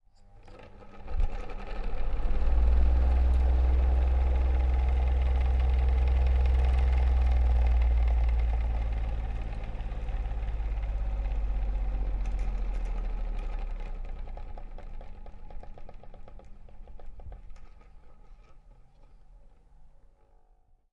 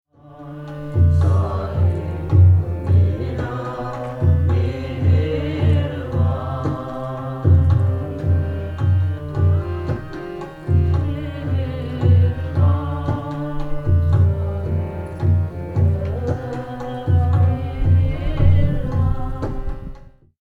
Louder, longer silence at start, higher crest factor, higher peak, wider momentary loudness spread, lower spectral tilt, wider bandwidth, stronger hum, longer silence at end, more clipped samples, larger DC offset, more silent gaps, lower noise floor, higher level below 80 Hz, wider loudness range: second, -30 LUFS vs -20 LUFS; about the same, 0.35 s vs 0.25 s; about the same, 16 dB vs 16 dB; second, -12 dBFS vs -2 dBFS; first, 23 LU vs 12 LU; about the same, -8.5 dB/octave vs -9.5 dB/octave; about the same, 4.4 kHz vs 4.5 kHz; neither; first, 1.05 s vs 0.35 s; neither; neither; neither; first, -61 dBFS vs -39 dBFS; about the same, -28 dBFS vs -28 dBFS; first, 18 LU vs 3 LU